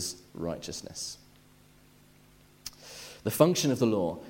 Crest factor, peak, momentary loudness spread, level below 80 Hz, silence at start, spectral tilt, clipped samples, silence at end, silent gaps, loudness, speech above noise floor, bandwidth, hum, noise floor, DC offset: 26 dB; -6 dBFS; 21 LU; -62 dBFS; 0 s; -5 dB/octave; under 0.1%; 0 s; none; -29 LUFS; 30 dB; 16.5 kHz; none; -59 dBFS; under 0.1%